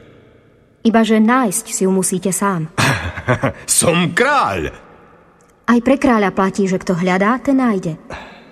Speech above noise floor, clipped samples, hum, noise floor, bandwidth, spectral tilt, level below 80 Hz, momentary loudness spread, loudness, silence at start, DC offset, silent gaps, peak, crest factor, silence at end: 35 dB; under 0.1%; none; -50 dBFS; 14 kHz; -4.5 dB/octave; -44 dBFS; 9 LU; -15 LUFS; 0.85 s; under 0.1%; none; -2 dBFS; 16 dB; 0.15 s